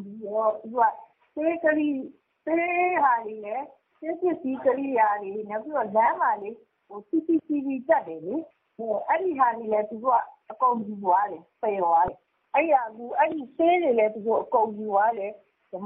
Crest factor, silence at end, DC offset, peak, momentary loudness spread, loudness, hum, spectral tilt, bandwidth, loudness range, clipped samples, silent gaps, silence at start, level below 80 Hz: 16 dB; 0 s; under 0.1%; -8 dBFS; 12 LU; -25 LUFS; none; -4 dB/octave; 3.8 kHz; 2 LU; under 0.1%; none; 0 s; -66 dBFS